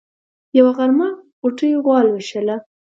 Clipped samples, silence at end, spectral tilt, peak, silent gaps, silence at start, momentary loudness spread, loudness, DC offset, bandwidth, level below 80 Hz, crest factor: under 0.1%; 0.35 s; -6 dB/octave; 0 dBFS; 1.32-1.42 s; 0.55 s; 10 LU; -17 LUFS; under 0.1%; 7.6 kHz; -72 dBFS; 16 dB